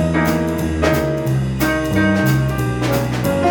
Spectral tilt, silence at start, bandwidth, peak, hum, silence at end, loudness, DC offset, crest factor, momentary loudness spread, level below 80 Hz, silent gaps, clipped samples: -6.5 dB/octave; 0 s; over 20 kHz; -4 dBFS; none; 0 s; -17 LUFS; under 0.1%; 14 dB; 4 LU; -32 dBFS; none; under 0.1%